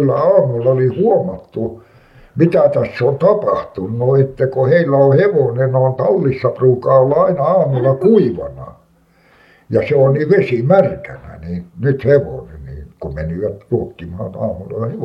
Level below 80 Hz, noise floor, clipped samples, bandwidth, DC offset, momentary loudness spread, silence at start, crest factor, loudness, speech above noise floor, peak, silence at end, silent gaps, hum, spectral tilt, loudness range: -44 dBFS; -52 dBFS; under 0.1%; 5.8 kHz; under 0.1%; 16 LU; 0 s; 14 dB; -14 LUFS; 38 dB; 0 dBFS; 0 s; none; none; -10.5 dB/octave; 6 LU